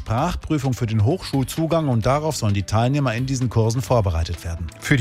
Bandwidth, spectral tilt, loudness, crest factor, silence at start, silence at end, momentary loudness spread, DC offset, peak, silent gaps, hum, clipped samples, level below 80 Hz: 15.5 kHz; -6 dB/octave; -21 LUFS; 18 dB; 0 s; 0 s; 5 LU; under 0.1%; -2 dBFS; none; none; under 0.1%; -36 dBFS